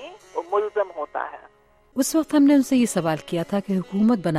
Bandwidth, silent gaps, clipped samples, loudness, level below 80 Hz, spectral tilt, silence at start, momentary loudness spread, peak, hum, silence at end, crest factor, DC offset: 15.5 kHz; none; under 0.1%; -22 LUFS; -60 dBFS; -5.5 dB/octave; 0 s; 15 LU; -8 dBFS; none; 0 s; 14 dB; under 0.1%